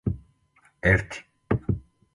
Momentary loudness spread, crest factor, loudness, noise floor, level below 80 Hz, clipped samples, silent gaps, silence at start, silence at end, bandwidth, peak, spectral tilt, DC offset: 16 LU; 24 dB; -26 LUFS; -63 dBFS; -40 dBFS; under 0.1%; none; 0.05 s; 0.35 s; 11.5 kHz; -4 dBFS; -7.5 dB/octave; under 0.1%